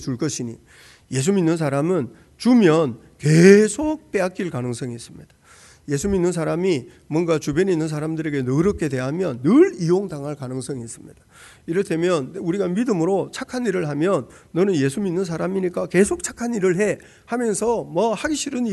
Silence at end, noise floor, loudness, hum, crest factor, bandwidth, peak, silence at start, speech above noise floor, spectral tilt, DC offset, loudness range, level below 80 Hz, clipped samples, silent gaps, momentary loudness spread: 0 s; -50 dBFS; -21 LUFS; none; 20 dB; 12 kHz; 0 dBFS; 0 s; 29 dB; -6 dB/octave; under 0.1%; 6 LU; -50 dBFS; under 0.1%; none; 13 LU